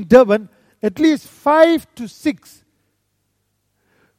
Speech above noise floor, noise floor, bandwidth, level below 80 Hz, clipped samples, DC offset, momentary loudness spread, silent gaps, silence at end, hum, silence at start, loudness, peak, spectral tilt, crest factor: 54 dB; -68 dBFS; 15.5 kHz; -52 dBFS; under 0.1%; under 0.1%; 13 LU; none; 1.85 s; 50 Hz at -60 dBFS; 0 s; -16 LUFS; 0 dBFS; -6 dB/octave; 18 dB